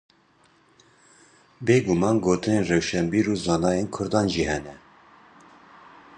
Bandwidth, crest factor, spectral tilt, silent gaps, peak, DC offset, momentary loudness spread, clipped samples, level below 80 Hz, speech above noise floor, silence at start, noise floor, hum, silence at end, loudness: 10 kHz; 20 dB; -5.5 dB/octave; none; -6 dBFS; under 0.1%; 6 LU; under 0.1%; -48 dBFS; 38 dB; 1.6 s; -60 dBFS; none; 1.4 s; -23 LUFS